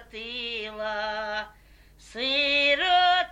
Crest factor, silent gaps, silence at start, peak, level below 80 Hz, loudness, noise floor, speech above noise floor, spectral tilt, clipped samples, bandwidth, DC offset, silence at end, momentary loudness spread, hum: 16 dB; none; 0 s; -10 dBFS; -56 dBFS; -24 LUFS; -54 dBFS; 25 dB; -2 dB/octave; under 0.1%; 11 kHz; under 0.1%; 0 s; 14 LU; none